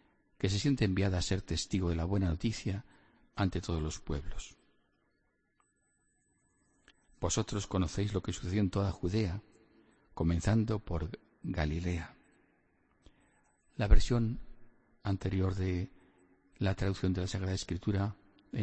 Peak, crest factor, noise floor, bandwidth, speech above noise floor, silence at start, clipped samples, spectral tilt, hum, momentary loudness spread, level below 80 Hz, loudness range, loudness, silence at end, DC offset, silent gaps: -10 dBFS; 24 dB; -76 dBFS; 8.4 kHz; 45 dB; 0.4 s; under 0.1%; -6 dB/octave; none; 13 LU; -40 dBFS; 7 LU; -34 LUFS; 0 s; under 0.1%; none